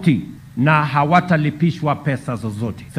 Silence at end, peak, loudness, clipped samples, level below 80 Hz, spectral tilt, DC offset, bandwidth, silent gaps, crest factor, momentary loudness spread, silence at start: 0 s; 0 dBFS; -18 LUFS; under 0.1%; -52 dBFS; -7.5 dB/octave; under 0.1%; 11.5 kHz; none; 18 dB; 10 LU; 0 s